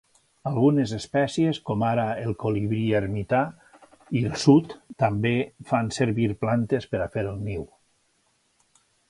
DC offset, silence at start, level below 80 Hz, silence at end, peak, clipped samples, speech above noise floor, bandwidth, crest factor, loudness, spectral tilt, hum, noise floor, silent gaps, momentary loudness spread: under 0.1%; 0.45 s; -52 dBFS; 1.45 s; -4 dBFS; under 0.1%; 44 dB; 11.5 kHz; 20 dB; -25 LUFS; -7 dB/octave; none; -68 dBFS; none; 9 LU